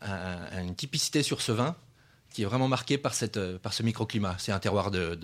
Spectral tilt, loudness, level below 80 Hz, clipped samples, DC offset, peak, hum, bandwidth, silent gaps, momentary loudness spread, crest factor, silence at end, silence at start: -4.5 dB/octave; -30 LUFS; -62 dBFS; under 0.1%; under 0.1%; -10 dBFS; none; 15.5 kHz; none; 9 LU; 20 dB; 0 s; 0 s